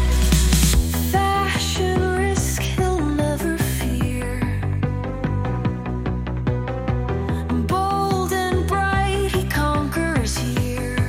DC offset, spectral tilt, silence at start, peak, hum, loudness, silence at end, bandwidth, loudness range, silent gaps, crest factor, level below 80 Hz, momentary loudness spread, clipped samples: under 0.1%; -5 dB/octave; 0 s; -6 dBFS; none; -21 LUFS; 0 s; 17 kHz; 4 LU; none; 14 dB; -26 dBFS; 6 LU; under 0.1%